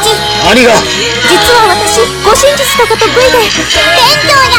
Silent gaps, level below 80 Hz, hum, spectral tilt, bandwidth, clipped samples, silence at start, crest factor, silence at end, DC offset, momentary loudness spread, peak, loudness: none; -28 dBFS; none; -2 dB/octave; over 20 kHz; 4%; 0 s; 6 dB; 0 s; under 0.1%; 4 LU; 0 dBFS; -6 LUFS